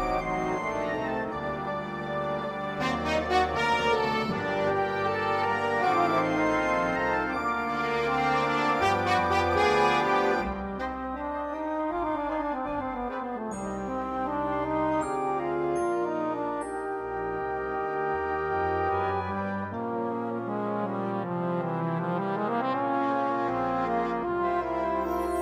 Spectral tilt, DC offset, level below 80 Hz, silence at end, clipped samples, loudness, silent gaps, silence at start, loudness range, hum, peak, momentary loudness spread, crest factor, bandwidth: -6 dB/octave; under 0.1%; -50 dBFS; 0 s; under 0.1%; -28 LUFS; none; 0 s; 5 LU; none; -12 dBFS; 8 LU; 16 dB; 15.5 kHz